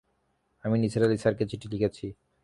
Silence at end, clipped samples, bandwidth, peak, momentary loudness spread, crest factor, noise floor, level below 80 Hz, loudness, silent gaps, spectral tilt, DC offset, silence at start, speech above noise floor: 0.3 s; under 0.1%; 11.5 kHz; -10 dBFS; 14 LU; 18 dB; -73 dBFS; -56 dBFS; -28 LUFS; none; -7.5 dB/octave; under 0.1%; 0.65 s; 46 dB